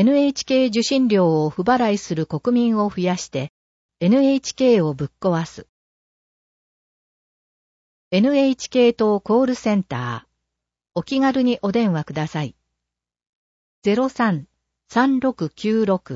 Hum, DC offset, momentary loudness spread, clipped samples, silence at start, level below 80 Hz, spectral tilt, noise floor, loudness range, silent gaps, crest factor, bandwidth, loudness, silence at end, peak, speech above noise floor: none; under 0.1%; 10 LU; under 0.1%; 0 s; -58 dBFS; -6 dB/octave; -83 dBFS; 5 LU; 3.49-3.89 s, 5.69-8.11 s, 13.29-13.82 s; 16 dB; 8 kHz; -20 LUFS; 0 s; -6 dBFS; 64 dB